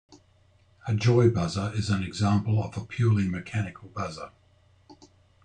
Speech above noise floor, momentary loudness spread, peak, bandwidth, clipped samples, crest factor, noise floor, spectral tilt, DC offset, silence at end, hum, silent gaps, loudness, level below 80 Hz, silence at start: 36 dB; 14 LU; -8 dBFS; 9.4 kHz; under 0.1%; 18 dB; -61 dBFS; -7 dB/octave; under 0.1%; 0.5 s; none; none; -27 LUFS; -56 dBFS; 0.1 s